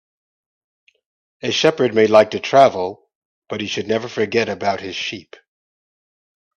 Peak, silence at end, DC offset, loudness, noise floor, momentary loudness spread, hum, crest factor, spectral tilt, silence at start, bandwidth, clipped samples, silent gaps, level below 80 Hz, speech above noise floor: 0 dBFS; 1.35 s; under 0.1%; -18 LUFS; under -90 dBFS; 14 LU; none; 20 dB; -4.5 dB/octave; 1.45 s; 8.4 kHz; under 0.1%; 3.15-3.42 s; -64 dBFS; over 73 dB